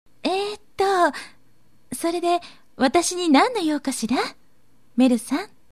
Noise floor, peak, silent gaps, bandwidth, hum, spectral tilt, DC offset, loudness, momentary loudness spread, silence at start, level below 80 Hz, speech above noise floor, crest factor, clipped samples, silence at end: -62 dBFS; -4 dBFS; none; 14 kHz; none; -3 dB/octave; 0.4%; -22 LUFS; 12 LU; 0.25 s; -62 dBFS; 41 dB; 20 dB; under 0.1%; 0.25 s